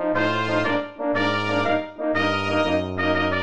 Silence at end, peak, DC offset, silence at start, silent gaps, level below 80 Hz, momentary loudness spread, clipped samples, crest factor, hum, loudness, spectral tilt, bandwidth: 0 s; -8 dBFS; 1%; 0 s; none; -56 dBFS; 3 LU; under 0.1%; 16 dB; none; -22 LUFS; -6 dB/octave; 9.2 kHz